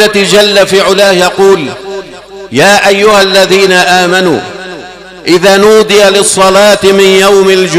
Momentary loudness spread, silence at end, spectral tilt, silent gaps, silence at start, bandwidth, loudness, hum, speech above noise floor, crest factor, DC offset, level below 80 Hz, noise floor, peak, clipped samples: 14 LU; 0 s; -3 dB/octave; none; 0 s; 16.5 kHz; -5 LUFS; none; 21 dB; 6 dB; under 0.1%; -40 dBFS; -26 dBFS; 0 dBFS; 4%